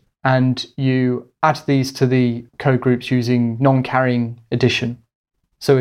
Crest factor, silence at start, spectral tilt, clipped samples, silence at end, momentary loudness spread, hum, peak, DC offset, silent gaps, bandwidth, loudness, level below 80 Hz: 16 dB; 0.25 s; -7 dB/octave; under 0.1%; 0 s; 5 LU; none; -2 dBFS; under 0.1%; 5.15-5.24 s; 14 kHz; -18 LUFS; -56 dBFS